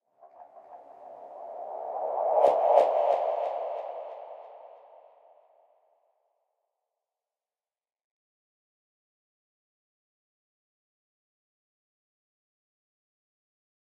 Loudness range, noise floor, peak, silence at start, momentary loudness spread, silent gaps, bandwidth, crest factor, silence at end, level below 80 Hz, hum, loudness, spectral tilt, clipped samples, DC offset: 16 LU; under -90 dBFS; -6 dBFS; 0.25 s; 26 LU; none; 9.8 kHz; 28 dB; 9.25 s; -88 dBFS; none; -27 LUFS; -4 dB/octave; under 0.1%; under 0.1%